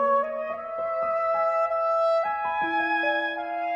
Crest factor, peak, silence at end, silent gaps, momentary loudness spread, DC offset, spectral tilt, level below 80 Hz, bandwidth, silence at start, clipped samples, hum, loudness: 12 dB; -14 dBFS; 0 s; none; 6 LU; under 0.1%; -4.5 dB/octave; -66 dBFS; 7.6 kHz; 0 s; under 0.1%; none; -25 LUFS